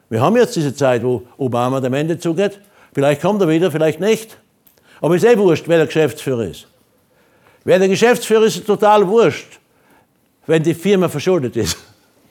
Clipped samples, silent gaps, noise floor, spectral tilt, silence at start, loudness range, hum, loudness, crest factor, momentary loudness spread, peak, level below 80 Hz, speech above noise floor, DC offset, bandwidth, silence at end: under 0.1%; none; -56 dBFS; -5.5 dB/octave; 0.1 s; 2 LU; none; -16 LUFS; 16 dB; 9 LU; 0 dBFS; -54 dBFS; 41 dB; under 0.1%; 18.5 kHz; 0.5 s